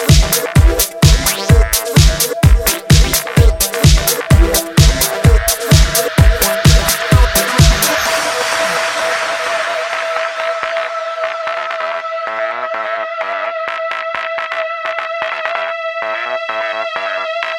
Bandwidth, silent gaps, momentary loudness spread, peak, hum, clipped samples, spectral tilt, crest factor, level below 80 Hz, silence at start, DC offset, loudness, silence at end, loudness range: 19 kHz; none; 9 LU; 0 dBFS; none; under 0.1%; -4 dB/octave; 14 dB; -18 dBFS; 0 s; under 0.1%; -14 LUFS; 0 s; 8 LU